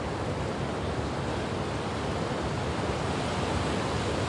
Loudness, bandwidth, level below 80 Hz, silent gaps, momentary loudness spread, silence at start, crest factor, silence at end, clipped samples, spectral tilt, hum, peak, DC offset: -31 LUFS; 11.5 kHz; -44 dBFS; none; 3 LU; 0 s; 14 dB; 0 s; under 0.1%; -5.5 dB/octave; none; -16 dBFS; under 0.1%